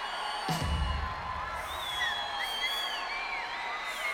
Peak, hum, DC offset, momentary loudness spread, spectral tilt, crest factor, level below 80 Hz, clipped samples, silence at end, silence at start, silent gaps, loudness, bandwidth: -18 dBFS; none; under 0.1%; 5 LU; -3 dB/octave; 16 dB; -44 dBFS; under 0.1%; 0 s; 0 s; none; -33 LUFS; 18 kHz